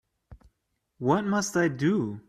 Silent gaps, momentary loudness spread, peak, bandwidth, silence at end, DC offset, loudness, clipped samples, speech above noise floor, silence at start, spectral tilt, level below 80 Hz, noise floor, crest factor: none; 2 LU; -10 dBFS; 14.5 kHz; 0.1 s; under 0.1%; -26 LUFS; under 0.1%; 52 dB; 0.3 s; -5.5 dB/octave; -60 dBFS; -78 dBFS; 18 dB